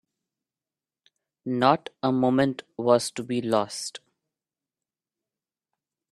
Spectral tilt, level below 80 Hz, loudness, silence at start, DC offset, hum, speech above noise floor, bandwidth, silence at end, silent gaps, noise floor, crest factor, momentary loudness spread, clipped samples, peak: -5 dB/octave; -70 dBFS; -25 LUFS; 1.45 s; under 0.1%; none; over 66 dB; 13 kHz; 2.15 s; none; under -90 dBFS; 24 dB; 12 LU; under 0.1%; -4 dBFS